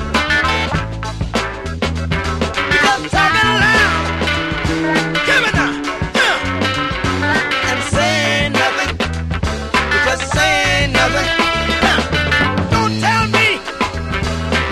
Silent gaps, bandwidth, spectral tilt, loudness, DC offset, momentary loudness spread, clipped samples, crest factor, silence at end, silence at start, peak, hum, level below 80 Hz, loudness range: none; 13 kHz; -4 dB/octave; -15 LUFS; under 0.1%; 8 LU; under 0.1%; 16 dB; 0 s; 0 s; 0 dBFS; none; -28 dBFS; 2 LU